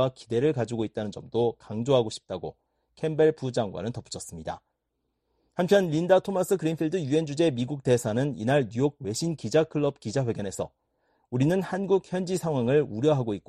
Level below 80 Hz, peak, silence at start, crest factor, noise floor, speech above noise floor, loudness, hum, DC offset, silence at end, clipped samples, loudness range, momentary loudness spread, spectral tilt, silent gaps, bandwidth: -60 dBFS; -8 dBFS; 0 s; 18 dB; -79 dBFS; 53 dB; -27 LUFS; none; under 0.1%; 0.1 s; under 0.1%; 4 LU; 13 LU; -6.5 dB/octave; none; 13 kHz